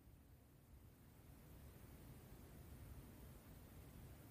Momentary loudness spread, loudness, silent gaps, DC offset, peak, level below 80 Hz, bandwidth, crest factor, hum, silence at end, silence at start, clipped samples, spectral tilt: 7 LU; -63 LUFS; none; under 0.1%; -48 dBFS; -66 dBFS; 15.5 kHz; 14 dB; none; 0 s; 0 s; under 0.1%; -6 dB/octave